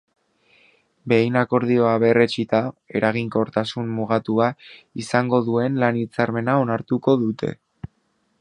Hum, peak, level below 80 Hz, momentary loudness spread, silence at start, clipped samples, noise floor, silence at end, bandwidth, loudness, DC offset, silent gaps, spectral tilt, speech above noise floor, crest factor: none; -2 dBFS; -58 dBFS; 15 LU; 1.05 s; under 0.1%; -68 dBFS; 0.55 s; 10.5 kHz; -21 LUFS; under 0.1%; none; -7 dB/octave; 47 dB; 20 dB